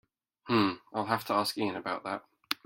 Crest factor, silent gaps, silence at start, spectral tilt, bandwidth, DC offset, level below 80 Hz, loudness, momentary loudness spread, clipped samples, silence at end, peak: 24 dB; none; 0.45 s; -4.5 dB/octave; 16.5 kHz; under 0.1%; -72 dBFS; -32 LUFS; 9 LU; under 0.1%; 0.1 s; -8 dBFS